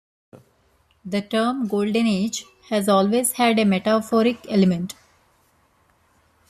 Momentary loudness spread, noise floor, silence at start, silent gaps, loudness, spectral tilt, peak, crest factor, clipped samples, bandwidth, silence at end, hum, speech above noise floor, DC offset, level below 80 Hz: 10 LU; -62 dBFS; 0.35 s; none; -21 LUFS; -5 dB/octave; -6 dBFS; 16 dB; under 0.1%; 14 kHz; 1.55 s; none; 42 dB; under 0.1%; -62 dBFS